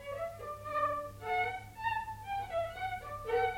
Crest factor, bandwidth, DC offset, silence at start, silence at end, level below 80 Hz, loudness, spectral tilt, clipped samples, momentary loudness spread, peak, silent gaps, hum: 16 dB; 16.5 kHz; under 0.1%; 0 s; 0 s; -56 dBFS; -37 LUFS; -4.5 dB/octave; under 0.1%; 7 LU; -22 dBFS; none; 50 Hz at -60 dBFS